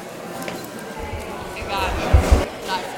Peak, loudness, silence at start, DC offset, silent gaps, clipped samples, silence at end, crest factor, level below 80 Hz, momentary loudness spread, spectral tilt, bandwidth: 0 dBFS; -23 LUFS; 0 s; under 0.1%; none; under 0.1%; 0 s; 22 dB; -24 dBFS; 14 LU; -5.5 dB/octave; 17.5 kHz